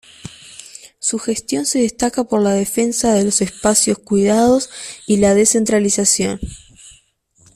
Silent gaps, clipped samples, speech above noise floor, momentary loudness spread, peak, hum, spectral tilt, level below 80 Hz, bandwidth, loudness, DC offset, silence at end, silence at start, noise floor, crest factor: none; under 0.1%; 40 dB; 20 LU; 0 dBFS; none; -4 dB/octave; -44 dBFS; 14.5 kHz; -16 LUFS; under 0.1%; 0.65 s; 0.25 s; -55 dBFS; 16 dB